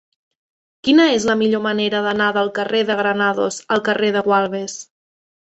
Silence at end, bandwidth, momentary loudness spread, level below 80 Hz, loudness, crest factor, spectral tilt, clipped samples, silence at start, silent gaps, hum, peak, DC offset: 0.75 s; 8.2 kHz; 9 LU; -60 dBFS; -17 LUFS; 16 dB; -4 dB/octave; under 0.1%; 0.85 s; none; none; -2 dBFS; under 0.1%